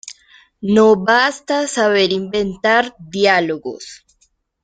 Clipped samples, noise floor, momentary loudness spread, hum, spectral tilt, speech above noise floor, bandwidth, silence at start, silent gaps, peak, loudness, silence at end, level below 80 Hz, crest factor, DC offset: under 0.1%; -62 dBFS; 16 LU; none; -4 dB/octave; 46 dB; 9.4 kHz; 0.05 s; none; -2 dBFS; -15 LUFS; 0.7 s; -54 dBFS; 16 dB; under 0.1%